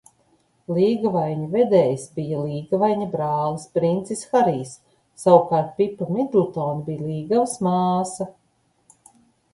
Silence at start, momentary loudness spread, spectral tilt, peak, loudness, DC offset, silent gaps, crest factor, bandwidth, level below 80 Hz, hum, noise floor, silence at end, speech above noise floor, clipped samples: 0.7 s; 11 LU; -7 dB/octave; 0 dBFS; -22 LUFS; under 0.1%; none; 22 dB; 11.5 kHz; -62 dBFS; none; -65 dBFS; 1.25 s; 45 dB; under 0.1%